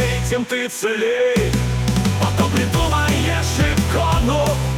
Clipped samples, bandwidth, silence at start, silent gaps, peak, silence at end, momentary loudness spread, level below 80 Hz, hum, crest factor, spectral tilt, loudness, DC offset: under 0.1%; 18 kHz; 0 s; none; -6 dBFS; 0 s; 3 LU; -28 dBFS; none; 12 dB; -5 dB/octave; -18 LUFS; under 0.1%